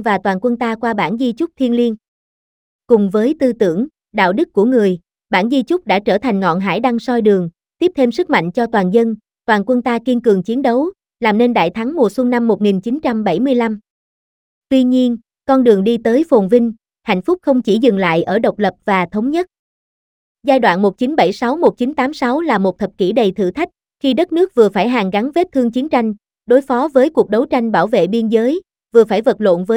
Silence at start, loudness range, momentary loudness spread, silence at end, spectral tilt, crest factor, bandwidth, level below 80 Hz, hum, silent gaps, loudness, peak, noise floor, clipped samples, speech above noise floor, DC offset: 0 s; 2 LU; 6 LU; 0 s; -7 dB/octave; 14 dB; 11 kHz; -54 dBFS; none; 2.08-2.79 s, 13.90-14.62 s, 19.59-20.35 s; -15 LUFS; 0 dBFS; under -90 dBFS; under 0.1%; over 76 dB; under 0.1%